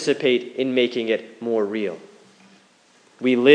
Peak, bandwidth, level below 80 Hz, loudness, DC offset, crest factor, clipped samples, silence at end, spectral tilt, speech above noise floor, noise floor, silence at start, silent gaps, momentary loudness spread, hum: 0 dBFS; 10 kHz; -84 dBFS; -22 LUFS; under 0.1%; 22 dB; under 0.1%; 0 s; -5 dB/octave; 36 dB; -56 dBFS; 0 s; none; 7 LU; none